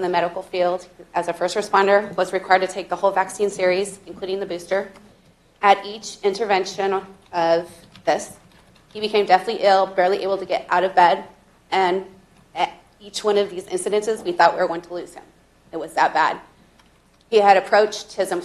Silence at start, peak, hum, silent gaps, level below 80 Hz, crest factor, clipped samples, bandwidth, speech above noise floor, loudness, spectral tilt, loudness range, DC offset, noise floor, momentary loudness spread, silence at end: 0 s; 0 dBFS; none; none; -60 dBFS; 22 dB; under 0.1%; 13 kHz; 36 dB; -20 LUFS; -3.5 dB/octave; 4 LU; under 0.1%; -56 dBFS; 13 LU; 0 s